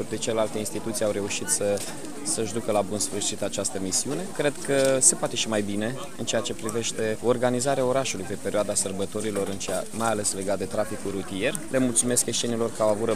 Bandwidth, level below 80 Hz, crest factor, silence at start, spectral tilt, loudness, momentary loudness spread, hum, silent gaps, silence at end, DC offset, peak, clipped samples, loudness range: 15.5 kHz; -58 dBFS; 22 dB; 0 s; -3 dB/octave; -26 LUFS; 7 LU; none; none; 0 s; 1%; -4 dBFS; under 0.1%; 3 LU